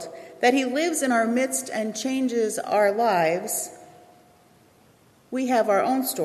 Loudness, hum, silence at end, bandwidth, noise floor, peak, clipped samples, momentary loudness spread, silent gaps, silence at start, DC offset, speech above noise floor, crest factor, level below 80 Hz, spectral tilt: -23 LUFS; none; 0 s; 14.5 kHz; -57 dBFS; -6 dBFS; under 0.1%; 8 LU; none; 0 s; under 0.1%; 34 dB; 18 dB; -74 dBFS; -3 dB/octave